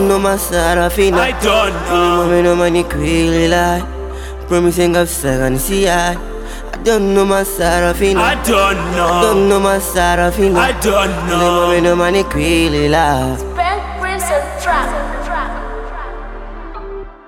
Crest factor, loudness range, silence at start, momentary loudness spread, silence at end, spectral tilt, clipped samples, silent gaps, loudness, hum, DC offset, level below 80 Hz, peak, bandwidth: 14 dB; 4 LU; 0 s; 14 LU; 0.1 s; -4.5 dB/octave; under 0.1%; none; -14 LUFS; none; 0.3%; -26 dBFS; 0 dBFS; 18 kHz